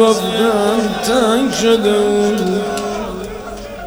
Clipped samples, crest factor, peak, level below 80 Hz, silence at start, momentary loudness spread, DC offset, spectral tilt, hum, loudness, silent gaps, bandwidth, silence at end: under 0.1%; 14 dB; 0 dBFS; -40 dBFS; 0 s; 13 LU; under 0.1%; -4.5 dB/octave; none; -15 LUFS; none; over 20 kHz; 0 s